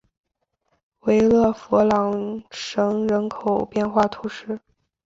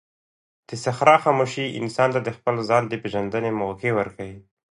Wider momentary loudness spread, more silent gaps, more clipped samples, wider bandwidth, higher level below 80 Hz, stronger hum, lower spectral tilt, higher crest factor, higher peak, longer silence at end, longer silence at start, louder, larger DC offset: about the same, 14 LU vs 13 LU; neither; neither; second, 7.8 kHz vs 11.5 kHz; first, -52 dBFS vs -58 dBFS; neither; about the same, -6.5 dB/octave vs -5.5 dB/octave; about the same, 18 dB vs 22 dB; about the same, -4 dBFS vs -2 dBFS; first, 0.45 s vs 0.3 s; first, 1.05 s vs 0.7 s; about the same, -21 LUFS vs -22 LUFS; neither